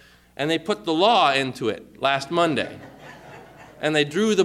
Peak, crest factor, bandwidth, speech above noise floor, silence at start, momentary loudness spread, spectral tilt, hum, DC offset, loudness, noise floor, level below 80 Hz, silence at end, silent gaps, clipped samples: -6 dBFS; 16 dB; 14.5 kHz; 23 dB; 0.4 s; 24 LU; -4.5 dB/octave; none; under 0.1%; -22 LUFS; -44 dBFS; -62 dBFS; 0 s; none; under 0.1%